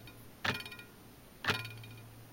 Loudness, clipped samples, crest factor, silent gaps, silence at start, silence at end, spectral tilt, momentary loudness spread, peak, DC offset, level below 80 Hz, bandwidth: -38 LUFS; under 0.1%; 26 dB; none; 0 s; 0 s; -3.5 dB/octave; 19 LU; -16 dBFS; under 0.1%; -64 dBFS; 17 kHz